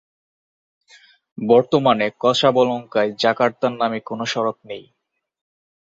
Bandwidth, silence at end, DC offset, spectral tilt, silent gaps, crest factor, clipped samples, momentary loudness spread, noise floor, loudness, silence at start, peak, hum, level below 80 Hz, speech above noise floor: 7.8 kHz; 1.05 s; under 0.1%; -5 dB/octave; none; 20 dB; under 0.1%; 11 LU; -52 dBFS; -19 LUFS; 1.4 s; -2 dBFS; none; -62 dBFS; 33 dB